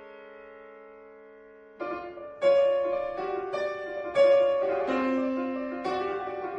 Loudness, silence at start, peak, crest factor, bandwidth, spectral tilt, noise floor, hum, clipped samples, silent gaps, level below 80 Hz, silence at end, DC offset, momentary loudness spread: -27 LUFS; 0 s; -12 dBFS; 16 dB; 7.8 kHz; -5.5 dB/octave; -51 dBFS; none; under 0.1%; none; -64 dBFS; 0 s; under 0.1%; 25 LU